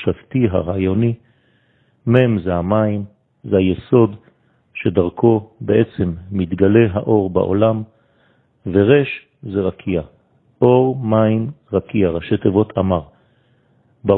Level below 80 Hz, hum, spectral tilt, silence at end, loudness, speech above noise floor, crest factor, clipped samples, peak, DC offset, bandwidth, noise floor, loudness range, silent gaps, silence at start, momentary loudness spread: -46 dBFS; none; -11.5 dB/octave; 0 s; -17 LUFS; 42 dB; 18 dB; under 0.1%; 0 dBFS; under 0.1%; 4.1 kHz; -58 dBFS; 2 LU; none; 0 s; 11 LU